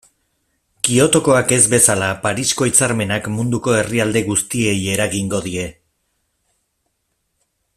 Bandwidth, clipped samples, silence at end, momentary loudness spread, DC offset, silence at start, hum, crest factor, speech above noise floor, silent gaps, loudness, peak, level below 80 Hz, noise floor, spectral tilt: 15.5 kHz; under 0.1%; 2.05 s; 9 LU; under 0.1%; 0.85 s; none; 18 dB; 54 dB; none; -16 LUFS; 0 dBFS; -50 dBFS; -70 dBFS; -3.5 dB/octave